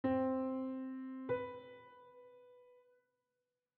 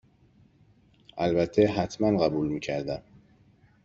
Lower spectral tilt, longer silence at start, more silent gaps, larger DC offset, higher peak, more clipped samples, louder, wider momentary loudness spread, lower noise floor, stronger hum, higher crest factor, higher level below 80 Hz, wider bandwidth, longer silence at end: about the same, -6.5 dB/octave vs -7 dB/octave; second, 0.05 s vs 1.15 s; neither; neither; second, -26 dBFS vs -8 dBFS; neither; second, -41 LUFS vs -27 LUFS; first, 24 LU vs 12 LU; first, -90 dBFS vs -61 dBFS; neither; about the same, 18 dB vs 20 dB; second, -78 dBFS vs -56 dBFS; second, 4.3 kHz vs 7.6 kHz; first, 1.05 s vs 0.85 s